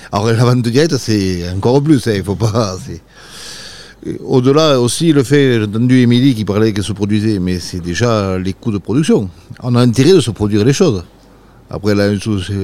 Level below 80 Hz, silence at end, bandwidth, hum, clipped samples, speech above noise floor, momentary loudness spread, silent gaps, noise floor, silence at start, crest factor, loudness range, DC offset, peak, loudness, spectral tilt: -42 dBFS; 0 s; 15 kHz; none; under 0.1%; 30 dB; 16 LU; none; -42 dBFS; 0 s; 14 dB; 4 LU; 1%; 0 dBFS; -13 LUFS; -6 dB/octave